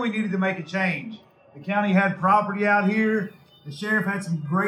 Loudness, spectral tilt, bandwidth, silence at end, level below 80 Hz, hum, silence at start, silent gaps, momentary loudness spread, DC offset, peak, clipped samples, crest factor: -23 LUFS; -7 dB/octave; 12 kHz; 0 s; -72 dBFS; none; 0 s; none; 13 LU; under 0.1%; -6 dBFS; under 0.1%; 18 dB